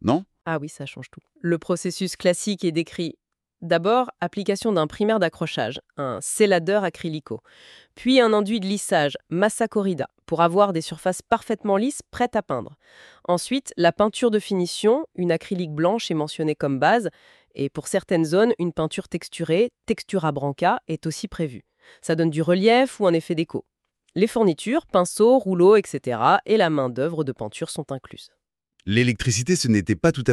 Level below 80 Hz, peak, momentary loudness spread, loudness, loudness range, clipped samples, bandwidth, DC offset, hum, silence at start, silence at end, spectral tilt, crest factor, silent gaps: -56 dBFS; -4 dBFS; 12 LU; -22 LUFS; 4 LU; under 0.1%; 13 kHz; under 0.1%; none; 0.05 s; 0 s; -5 dB/octave; 18 dB; none